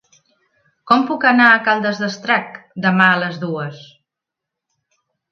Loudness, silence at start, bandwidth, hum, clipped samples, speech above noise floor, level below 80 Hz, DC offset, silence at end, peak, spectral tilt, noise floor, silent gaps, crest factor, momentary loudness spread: -15 LUFS; 0.85 s; 7.4 kHz; none; under 0.1%; 68 dB; -68 dBFS; under 0.1%; 1.45 s; 0 dBFS; -5.5 dB/octave; -84 dBFS; none; 18 dB; 13 LU